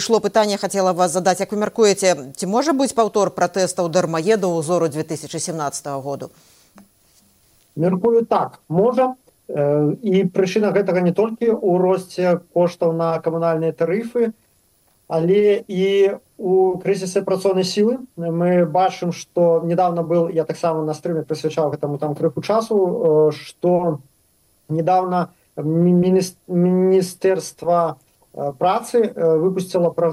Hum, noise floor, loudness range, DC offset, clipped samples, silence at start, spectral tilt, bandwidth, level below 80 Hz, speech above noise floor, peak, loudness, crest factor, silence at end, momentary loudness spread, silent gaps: none; -60 dBFS; 3 LU; under 0.1%; under 0.1%; 0 s; -6 dB/octave; 16 kHz; -64 dBFS; 42 dB; -2 dBFS; -19 LUFS; 16 dB; 0 s; 8 LU; none